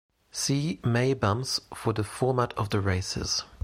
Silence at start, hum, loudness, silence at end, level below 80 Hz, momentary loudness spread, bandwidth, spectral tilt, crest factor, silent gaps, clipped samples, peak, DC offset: 0.35 s; none; -28 LUFS; 0.1 s; -52 dBFS; 5 LU; 16 kHz; -4.5 dB/octave; 18 dB; none; under 0.1%; -10 dBFS; under 0.1%